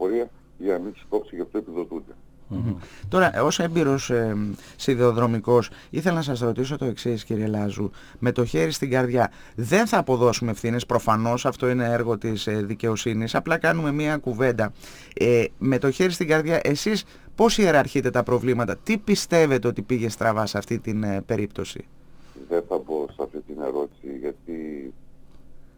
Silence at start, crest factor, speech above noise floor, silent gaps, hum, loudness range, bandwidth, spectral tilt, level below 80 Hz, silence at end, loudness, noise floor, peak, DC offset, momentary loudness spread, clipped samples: 0 s; 20 dB; 22 dB; none; none; 7 LU; over 20 kHz; -5.5 dB/octave; -48 dBFS; 0.1 s; -24 LUFS; -45 dBFS; -4 dBFS; under 0.1%; 13 LU; under 0.1%